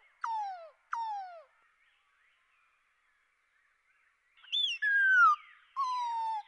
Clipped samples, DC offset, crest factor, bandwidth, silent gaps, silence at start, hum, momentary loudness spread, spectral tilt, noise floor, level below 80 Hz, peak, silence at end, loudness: under 0.1%; under 0.1%; 18 dB; 10.5 kHz; none; 0.25 s; none; 19 LU; 6 dB/octave; -73 dBFS; under -90 dBFS; -16 dBFS; 0.05 s; -29 LUFS